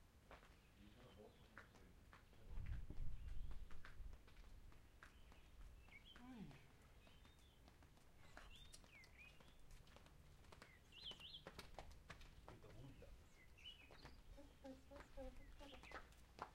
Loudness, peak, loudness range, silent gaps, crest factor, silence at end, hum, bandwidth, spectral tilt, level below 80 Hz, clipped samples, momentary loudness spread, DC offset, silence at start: -62 LUFS; -34 dBFS; 6 LU; none; 24 dB; 0 s; none; 16 kHz; -4.5 dB/octave; -62 dBFS; under 0.1%; 12 LU; under 0.1%; 0 s